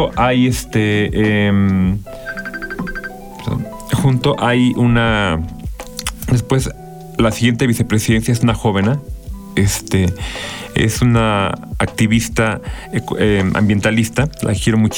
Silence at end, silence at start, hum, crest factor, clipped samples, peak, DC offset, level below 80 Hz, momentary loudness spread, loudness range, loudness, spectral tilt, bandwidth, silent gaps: 0 s; 0 s; none; 12 dB; under 0.1%; -2 dBFS; under 0.1%; -32 dBFS; 12 LU; 2 LU; -16 LUFS; -5.5 dB/octave; over 20 kHz; none